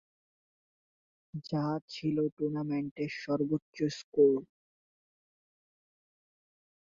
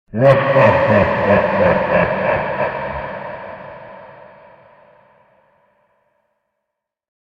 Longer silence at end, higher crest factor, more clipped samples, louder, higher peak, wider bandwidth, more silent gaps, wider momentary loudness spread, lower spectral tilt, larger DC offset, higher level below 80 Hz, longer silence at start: second, 2.4 s vs 3.1 s; about the same, 20 dB vs 18 dB; neither; second, -32 LUFS vs -15 LUFS; second, -14 dBFS vs 0 dBFS; first, 7.4 kHz vs 6.6 kHz; first, 1.82-1.88 s, 2.32-2.37 s, 2.91-2.96 s, 3.62-3.73 s, 4.04-4.12 s vs none; second, 10 LU vs 21 LU; second, -7 dB/octave vs -8.5 dB/octave; neither; second, -74 dBFS vs -44 dBFS; first, 1.35 s vs 0.15 s